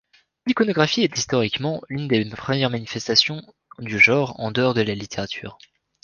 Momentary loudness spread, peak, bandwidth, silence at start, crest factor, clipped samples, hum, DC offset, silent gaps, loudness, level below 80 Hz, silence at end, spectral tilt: 15 LU; -2 dBFS; 10 kHz; 0.45 s; 20 dB; under 0.1%; none; under 0.1%; none; -21 LUFS; -56 dBFS; 0.5 s; -4.5 dB/octave